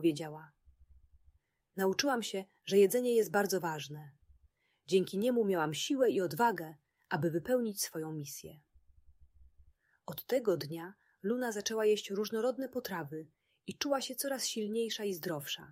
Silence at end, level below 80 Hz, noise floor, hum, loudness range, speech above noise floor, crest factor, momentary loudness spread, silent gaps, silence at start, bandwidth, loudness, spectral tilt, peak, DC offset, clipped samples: 0 s; -72 dBFS; -72 dBFS; none; 6 LU; 38 dB; 20 dB; 15 LU; none; 0 s; 16 kHz; -34 LUFS; -4 dB/octave; -14 dBFS; under 0.1%; under 0.1%